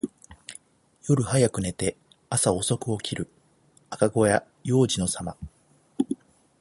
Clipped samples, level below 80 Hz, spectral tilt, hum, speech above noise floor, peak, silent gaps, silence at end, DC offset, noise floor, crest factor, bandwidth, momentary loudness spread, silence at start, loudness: under 0.1%; -52 dBFS; -5 dB/octave; none; 37 dB; -6 dBFS; none; 0.45 s; under 0.1%; -61 dBFS; 22 dB; 12 kHz; 20 LU; 0.05 s; -25 LUFS